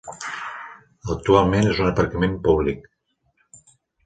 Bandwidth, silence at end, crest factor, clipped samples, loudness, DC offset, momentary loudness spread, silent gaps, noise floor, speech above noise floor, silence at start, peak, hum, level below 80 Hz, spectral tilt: 9.4 kHz; 1.25 s; 20 dB; under 0.1%; -21 LUFS; under 0.1%; 18 LU; none; -67 dBFS; 48 dB; 0.05 s; -2 dBFS; none; -40 dBFS; -6.5 dB/octave